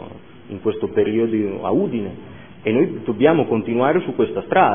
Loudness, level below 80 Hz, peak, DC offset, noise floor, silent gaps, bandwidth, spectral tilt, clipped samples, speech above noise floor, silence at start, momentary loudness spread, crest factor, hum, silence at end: -20 LUFS; -56 dBFS; 0 dBFS; 0.5%; -38 dBFS; none; 3.6 kHz; -11 dB/octave; under 0.1%; 20 dB; 0 s; 14 LU; 18 dB; none; 0 s